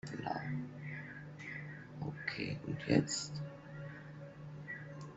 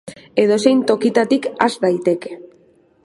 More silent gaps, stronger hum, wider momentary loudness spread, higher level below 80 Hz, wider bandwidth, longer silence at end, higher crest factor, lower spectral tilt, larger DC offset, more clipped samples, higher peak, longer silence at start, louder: neither; neither; first, 16 LU vs 9 LU; about the same, -68 dBFS vs -64 dBFS; second, 8.2 kHz vs 11.5 kHz; second, 0 s vs 0.6 s; first, 26 dB vs 18 dB; about the same, -5 dB/octave vs -5 dB/octave; neither; neither; second, -16 dBFS vs 0 dBFS; about the same, 0.05 s vs 0.05 s; second, -41 LUFS vs -17 LUFS